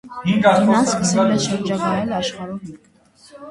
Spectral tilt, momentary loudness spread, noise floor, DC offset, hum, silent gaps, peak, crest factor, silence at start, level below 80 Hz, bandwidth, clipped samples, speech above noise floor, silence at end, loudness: -5 dB/octave; 16 LU; -45 dBFS; under 0.1%; none; none; 0 dBFS; 18 dB; 0.05 s; -54 dBFS; 11.5 kHz; under 0.1%; 28 dB; 0 s; -18 LUFS